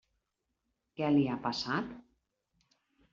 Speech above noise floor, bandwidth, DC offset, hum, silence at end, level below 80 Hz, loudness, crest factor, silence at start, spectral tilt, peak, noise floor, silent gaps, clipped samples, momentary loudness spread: 52 dB; 7.4 kHz; under 0.1%; none; 1.1 s; -70 dBFS; -32 LUFS; 18 dB; 1 s; -4.5 dB/octave; -18 dBFS; -84 dBFS; none; under 0.1%; 14 LU